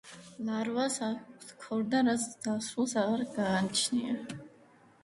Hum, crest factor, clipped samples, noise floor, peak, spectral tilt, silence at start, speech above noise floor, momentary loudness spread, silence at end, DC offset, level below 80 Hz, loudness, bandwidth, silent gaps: none; 16 dB; under 0.1%; -60 dBFS; -16 dBFS; -4 dB/octave; 0.05 s; 29 dB; 15 LU; 0.55 s; under 0.1%; -72 dBFS; -32 LUFS; 11.5 kHz; none